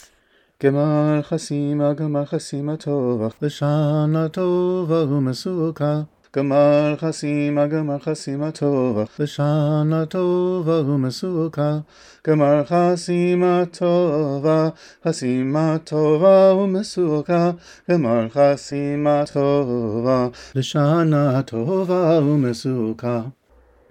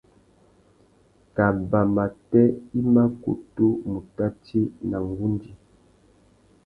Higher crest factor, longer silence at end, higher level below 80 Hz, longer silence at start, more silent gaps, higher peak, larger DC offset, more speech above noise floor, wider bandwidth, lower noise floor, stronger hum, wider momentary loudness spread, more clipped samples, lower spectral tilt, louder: about the same, 16 dB vs 20 dB; second, 0.6 s vs 1.1 s; second, -60 dBFS vs -50 dBFS; second, 0.6 s vs 1.35 s; neither; about the same, -2 dBFS vs -4 dBFS; neither; first, 41 dB vs 36 dB; first, 10 kHz vs 5.2 kHz; about the same, -59 dBFS vs -59 dBFS; neither; about the same, 8 LU vs 10 LU; neither; second, -7.5 dB/octave vs -11 dB/octave; first, -20 LUFS vs -24 LUFS